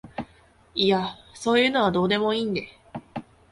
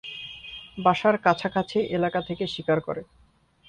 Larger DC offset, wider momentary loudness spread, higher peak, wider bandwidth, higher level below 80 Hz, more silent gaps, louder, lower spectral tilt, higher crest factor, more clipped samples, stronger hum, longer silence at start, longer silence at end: neither; first, 19 LU vs 15 LU; about the same, -8 dBFS vs -6 dBFS; first, 11.5 kHz vs 10 kHz; about the same, -56 dBFS vs -58 dBFS; neither; about the same, -23 LUFS vs -25 LUFS; second, -5 dB/octave vs -6.5 dB/octave; about the same, 18 dB vs 20 dB; neither; neither; about the same, 0.05 s vs 0.05 s; second, 0.3 s vs 0.65 s